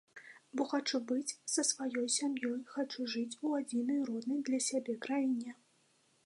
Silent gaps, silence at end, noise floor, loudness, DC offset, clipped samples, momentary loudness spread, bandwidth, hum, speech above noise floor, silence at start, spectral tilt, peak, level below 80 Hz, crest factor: none; 0.75 s; -72 dBFS; -36 LUFS; under 0.1%; under 0.1%; 6 LU; 11.5 kHz; none; 36 dB; 0.15 s; -2 dB/octave; -16 dBFS; under -90 dBFS; 20 dB